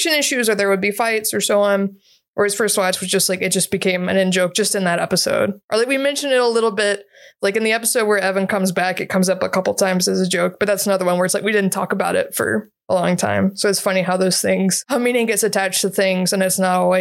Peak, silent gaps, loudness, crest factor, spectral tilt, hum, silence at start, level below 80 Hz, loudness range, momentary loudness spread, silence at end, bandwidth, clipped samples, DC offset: -4 dBFS; 2.28-2.33 s, 5.64-5.68 s; -18 LUFS; 14 dB; -3.5 dB/octave; none; 0 s; -64 dBFS; 1 LU; 4 LU; 0 s; 16.5 kHz; under 0.1%; under 0.1%